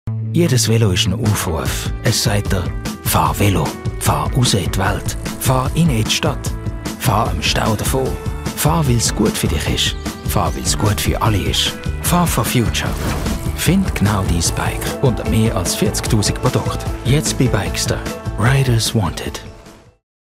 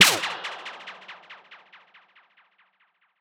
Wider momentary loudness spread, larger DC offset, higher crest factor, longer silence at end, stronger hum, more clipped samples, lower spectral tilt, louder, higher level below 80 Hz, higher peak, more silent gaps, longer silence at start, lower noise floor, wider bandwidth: second, 7 LU vs 23 LU; neither; second, 16 dB vs 28 dB; second, 0.6 s vs 1.65 s; neither; neither; first, -4.5 dB/octave vs 0 dB/octave; first, -17 LUFS vs -25 LUFS; first, -28 dBFS vs -74 dBFS; about the same, -2 dBFS vs 0 dBFS; neither; about the same, 0.05 s vs 0 s; second, -41 dBFS vs -68 dBFS; second, 16 kHz vs over 20 kHz